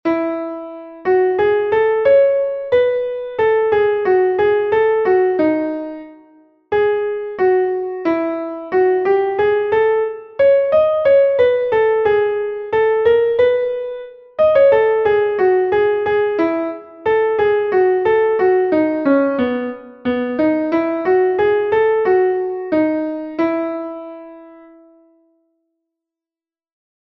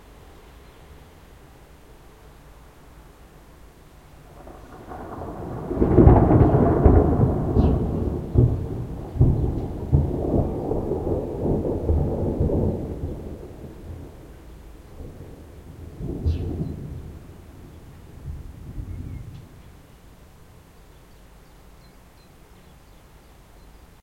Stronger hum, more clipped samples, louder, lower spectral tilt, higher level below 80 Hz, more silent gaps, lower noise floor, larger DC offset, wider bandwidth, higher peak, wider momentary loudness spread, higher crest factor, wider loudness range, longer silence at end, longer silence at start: neither; neither; first, -16 LUFS vs -22 LUFS; second, -8 dB/octave vs -10.5 dB/octave; second, -54 dBFS vs -32 dBFS; neither; first, under -90 dBFS vs -49 dBFS; neither; second, 5.6 kHz vs 9 kHz; about the same, -2 dBFS vs 0 dBFS; second, 11 LU vs 27 LU; second, 14 dB vs 24 dB; second, 5 LU vs 22 LU; first, 2.55 s vs 0.3 s; about the same, 0.05 s vs 0.1 s